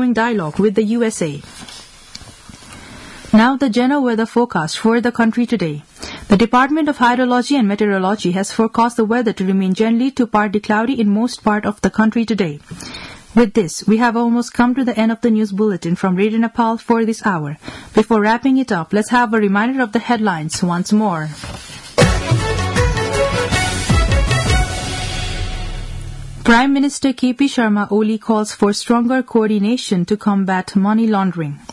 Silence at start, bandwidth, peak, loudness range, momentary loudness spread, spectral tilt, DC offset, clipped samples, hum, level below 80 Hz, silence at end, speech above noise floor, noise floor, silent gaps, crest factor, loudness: 0 s; 12 kHz; -2 dBFS; 2 LU; 15 LU; -5.5 dB/octave; under 0.1%; under 0.1%; none; -30 dBFS; 0.15 s; 23 dB; -38 dBFS; none; 14 dB; -16 LUFS